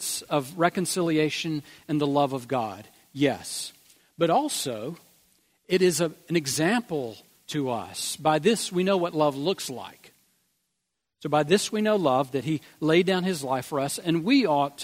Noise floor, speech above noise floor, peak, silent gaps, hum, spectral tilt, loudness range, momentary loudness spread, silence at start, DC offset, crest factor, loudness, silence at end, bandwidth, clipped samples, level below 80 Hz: -81 dBFS; 56 dB; -6 dBFS; none; none; -4.5 dB/octave; 3 LU; 12 LU; 0 s; under 0.1%; 20 dB; -26 LUFS; 0 s; 16 kHz; under 0.1%; -68 dBFS